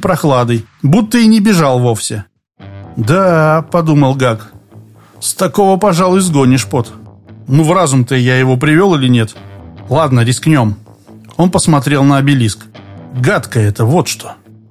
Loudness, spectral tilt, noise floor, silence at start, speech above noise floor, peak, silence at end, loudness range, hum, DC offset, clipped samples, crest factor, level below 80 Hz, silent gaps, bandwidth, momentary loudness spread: -11 LUFS; -6 dB/octave; -38 dBFS; 0 s; 28 dB; 0 dBFS; 0.35 s; 2 LU; none; under 0.1%; under 0.1%; 12 dB; -42 dBFS; none; 15.5 kHz; 11 LU